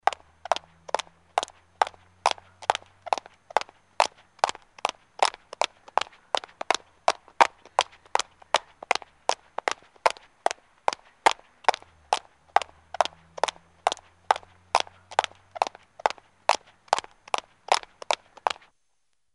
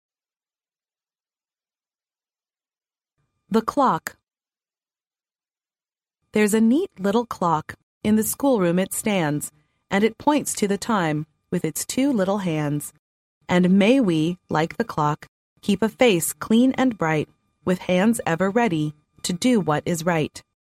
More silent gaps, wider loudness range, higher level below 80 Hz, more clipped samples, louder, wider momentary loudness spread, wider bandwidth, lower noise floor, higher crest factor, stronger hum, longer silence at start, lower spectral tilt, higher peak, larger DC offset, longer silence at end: second, none vs 7.83-8.01 s, 12.99-13.41 s, 15.28-15.56 s; second, 2 LU vs 7 LU; second, -68 dBFS vs -60 dBFS; neither; second, -29 LUFS vs -22 LUFS; second, 5 LU vs 10 LU; second, 11.5 kHz vs 16 kHz; second, -78 dBFS vs under -90 dBFS; first, 28 dB vs 18 dB; neither; second, 0.05 s vs 3.5 s; second, 0 dB/octave vs -5 dB/octave; about the same, -2 dBFS vs -4 dBFS; neither; first, 0.85 s vs 0.4 s